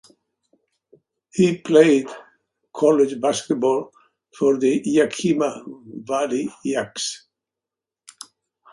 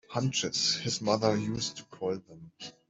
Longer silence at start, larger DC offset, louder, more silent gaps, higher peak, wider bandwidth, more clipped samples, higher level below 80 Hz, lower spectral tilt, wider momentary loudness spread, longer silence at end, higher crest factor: first, 1.35 s vs 0.1 s; neither; first, -20 LUFS vs -30 LUFS; neither; first, -2 dBFS vs -12 dBFS; first, 11.5 kHz vs 8.2 kHz; neither; about the same, -66 dBFS vs -64 dBFS; about the same, -5 dB/octave vs -4 dB/octave; first, 23 LU vs 11 LU; first, 1.55 s vs 0.2 s; about the same, 20 dB vs 20 dB